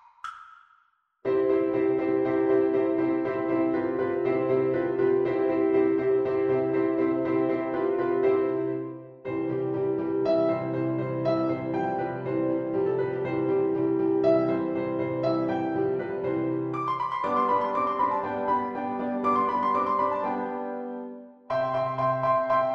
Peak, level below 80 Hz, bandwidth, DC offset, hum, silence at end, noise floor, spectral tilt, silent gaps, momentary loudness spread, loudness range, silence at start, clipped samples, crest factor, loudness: -12 dBFS; -64 dBFS; 5.8 kHz; under 0.1%; none; 0 s; -66 dBFS; -9 dB/octave; none; 7 LU; 3 LU; 0.25 s; under 0.1%; 14 dB; -26 LUFS